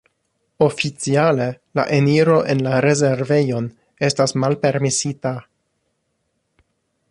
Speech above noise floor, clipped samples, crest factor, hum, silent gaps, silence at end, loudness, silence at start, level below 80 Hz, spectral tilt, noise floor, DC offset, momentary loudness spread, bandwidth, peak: 54 dB; under 0.1%; 16 dB; none; none; 1.7 s; -18 LUFS; 0.6 s; -58 dBFS; -5.5 dB/octave; -71 dBFS; under 0.1%; 8 LU; 11 kHz; -2 dBFS